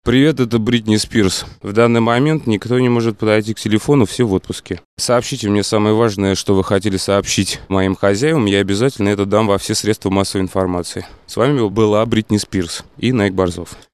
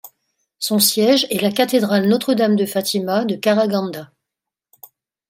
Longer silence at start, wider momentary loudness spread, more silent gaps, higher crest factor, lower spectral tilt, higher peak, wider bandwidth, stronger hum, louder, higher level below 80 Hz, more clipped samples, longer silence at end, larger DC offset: about the same, 0.05 s vs 0.05 s; about the same, 7 LU vs 7 LU; first, 4.85-4.97 s vs none; about the same, 16 dB vs 18 dB; first, -5.5 dB/octave vs -4 dB/octave; about the same, 0 dBFS vs 0 dBFS; second, 13 kHz vs 16.5 kHz; neither; about the same, -16 LUFS vs -17 LUFS; first, -44 dBFS vs -68 dBFS; neither; second, 0.15 s vs 1.25 s; first, 0.2% vs under 0.1%